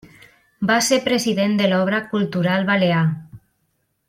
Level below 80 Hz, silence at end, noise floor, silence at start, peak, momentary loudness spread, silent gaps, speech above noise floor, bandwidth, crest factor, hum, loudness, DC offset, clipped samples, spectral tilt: -60 dBFS; 0.7 s; -69 dBFS; 0.6 s; -4 dBFS; 6 LU; none; 51 dB; 16 kHz; 16 dB; none; -19 LUFS; under 0.1%; under 0.1%; -5 dB/octave